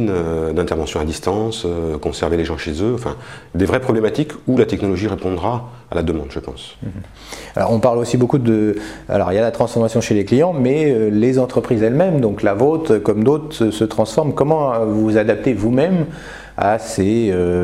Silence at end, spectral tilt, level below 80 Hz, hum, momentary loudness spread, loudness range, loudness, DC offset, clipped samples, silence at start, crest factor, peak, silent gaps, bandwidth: 0 s; -7 dB/octave; -38 dBFS; none; 11 LU; 5 LU; -17 LUFS; 0.2%; under 0.1%; 0 s; 16 dB; 0 dBFS; none; 14 kHz